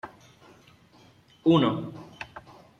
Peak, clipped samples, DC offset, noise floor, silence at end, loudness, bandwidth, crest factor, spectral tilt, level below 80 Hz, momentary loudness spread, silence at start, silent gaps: -10 dBFS; under 0.1%; under 0.1%; -57 dBFS; 0.4 s; -24 LUFS; 7 kHz; 20 dB; -8 dB/octave; -64 dBFS; 23 LU; 0.05 s; none